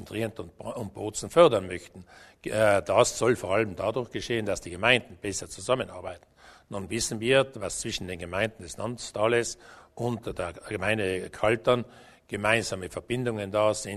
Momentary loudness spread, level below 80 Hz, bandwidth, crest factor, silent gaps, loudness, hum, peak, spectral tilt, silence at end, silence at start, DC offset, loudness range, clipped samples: 15 LU; -54 dBFS; 13.5 kHz; 24 dB; none; -27 LUFS; none; -4 dBFS; -4 dB/octave; 0 s; 0 s; under 0.1%; 5 LU; under 0.1%